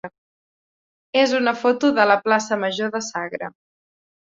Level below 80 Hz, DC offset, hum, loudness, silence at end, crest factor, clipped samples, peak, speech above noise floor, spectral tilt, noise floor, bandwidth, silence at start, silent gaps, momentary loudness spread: -70 dBFS; under 0.1%; none; -20 LUFS; 0.75 s; 20 dB; under 0.1%; -2 dBFS; over 70 dB; -3.5 dB/octave; under -90 dBFS; 7.8 kHz; 0.05 s; 0.18-1.13 s; 14 LU